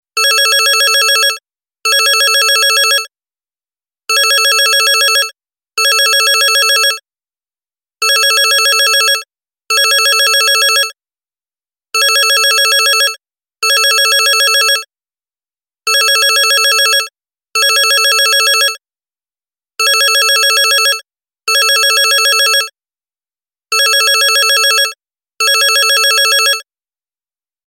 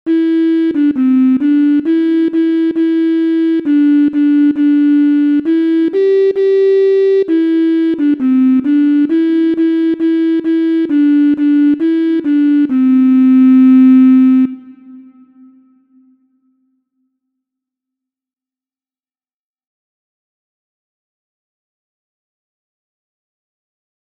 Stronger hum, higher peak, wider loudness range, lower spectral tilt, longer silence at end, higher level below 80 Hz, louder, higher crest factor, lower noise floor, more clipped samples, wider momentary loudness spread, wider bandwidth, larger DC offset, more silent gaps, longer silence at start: neither; about the same, 0 dBFS vs -2 dBFS; about the same, 2 LU vs 3 LU; second, 7 dB/octave vs -7.5 dB/octave; second, 1.05 s vs 9.1 s; second, -88 dBFS vs -64 dBFS; about the same, -9 LUFS vs -11 LUFS; about the same, 12 dB vs 10 dB; about the same, under -90 dBFS vs under -90 dBFS; neither; about the same, 8 LU vs 6 LU; first, 17 kHz vs 4.9 kHz; neither; neither; about the same, 0.15 s vs 0.05 s